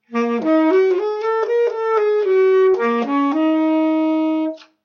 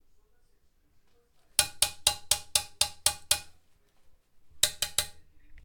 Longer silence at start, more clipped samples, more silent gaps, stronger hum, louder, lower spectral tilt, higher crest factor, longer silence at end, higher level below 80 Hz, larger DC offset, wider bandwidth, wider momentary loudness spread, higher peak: second, 0.1 s vs 1.6 s; neither; neither; neither; first, -17 LUFS vs -28 LUFS; first, -6 dB/octave vs 1.5 dB/octave; second, 10 dB vs 30 dB; first, 0.2 s vs 0.05 s; second, -76 dBFS vs -56 dBFS; neither; second, 6.6 kHz vs over 20 kHz; about the same, 6 LU vs 4 LU; second, -6 dBFS vs -2 dBFS